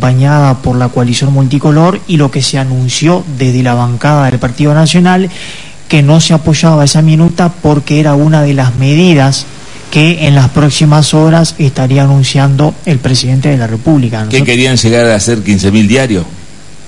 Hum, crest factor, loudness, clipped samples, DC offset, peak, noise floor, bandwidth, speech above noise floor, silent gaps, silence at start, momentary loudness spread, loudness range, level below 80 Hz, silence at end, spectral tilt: none; 8 dB; -8 LUFS; 1%; 4%; 0 dBFS; -32 dBFS; 11 kHz; 25 dB; none; 0 s; 5 LU; 2 LU; -36 dBFS; 0.4 s; -5.5 dB/octave